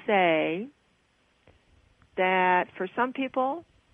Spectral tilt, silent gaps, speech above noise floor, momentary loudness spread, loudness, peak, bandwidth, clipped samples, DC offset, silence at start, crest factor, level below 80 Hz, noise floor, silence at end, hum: -7.5 dB/octave; none; 42 dB; 15 LU; -26 LUFS; -10 dBFS; 3.9 kHz; under 0.1%; under 0.1%; 0.05 s; 18 dB; -70 dBFS; -67 dBFS; 0.3 s; none